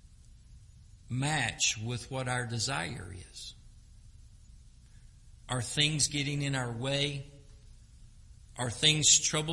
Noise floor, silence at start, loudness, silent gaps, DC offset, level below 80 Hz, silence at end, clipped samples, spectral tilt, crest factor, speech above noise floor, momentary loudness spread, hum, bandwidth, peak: -55 dBFS; 0.3 s; -29 LUFS; none; under 0.1%; -54 dBFS; 0 s; under 0.1%; -2.5 dB/octave; 24 dB; 24 dB; 21 LU; none; 11.5 kHz; -10 dBFS